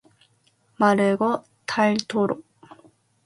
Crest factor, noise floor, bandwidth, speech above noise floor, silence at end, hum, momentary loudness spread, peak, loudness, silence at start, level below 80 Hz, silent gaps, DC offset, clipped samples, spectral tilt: 20 dB; -64 dBFS; 11.5 kHz; 43 dB; 0.85 s; none; 10 LU; -4 dBFS; -23 LUFS; 0.8 s; -68 dBFS; none; under 0.1%; under 0.1%; -5.5 dB/octave